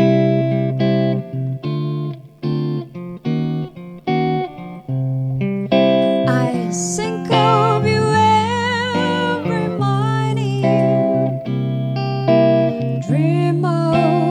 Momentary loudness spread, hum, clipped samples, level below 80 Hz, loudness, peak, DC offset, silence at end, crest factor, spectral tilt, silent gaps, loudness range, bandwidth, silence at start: 10 LU; none; under 0.1%; -56 dBFS; -18 LUFS; 0 dBFS; under 0.1%; 0 s; 16 dB; -6.5 dB/octave; none; 6 LU; 11 kHz; 0 s